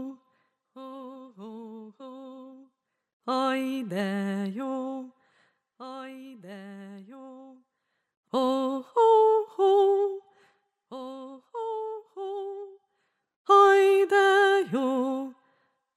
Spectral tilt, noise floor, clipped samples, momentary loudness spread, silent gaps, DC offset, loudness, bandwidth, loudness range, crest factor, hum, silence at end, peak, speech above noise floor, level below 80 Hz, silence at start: -5 dB/octave; -79 dBFS; under 0.1%; 25 LU; 3.13-3.20 s, 8.17-8.23 s, 13.36-13.45 s; under 0.1%; -24 LUFS; 12 kHz; 17 LU; 18 dB; none; 0.65 s; -8 dBFS; 49 dB; -88 dBFS; 0 s